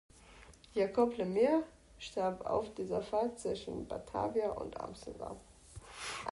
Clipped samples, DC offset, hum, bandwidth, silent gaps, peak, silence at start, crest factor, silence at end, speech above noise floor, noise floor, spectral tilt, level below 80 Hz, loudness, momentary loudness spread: under 0.1%; under 0.1%; none; 11.5 kHz; none; -18 dBFS; 0.15 s; 18 dB; 0 s; 23 dB; -58 dBFS; -5.5 dB/octave; -60 dBFS; -36 LUFS; 18 LU